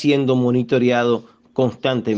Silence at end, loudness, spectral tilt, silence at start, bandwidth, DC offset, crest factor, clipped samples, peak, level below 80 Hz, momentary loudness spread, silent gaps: 0 s; -19 LUFS; -7 dB/octave; 0 s; 7.4 kHz; under 0.1%; 14 dB; under 0.1%; -4 dBFS; -62 dBFS; 6 LU; none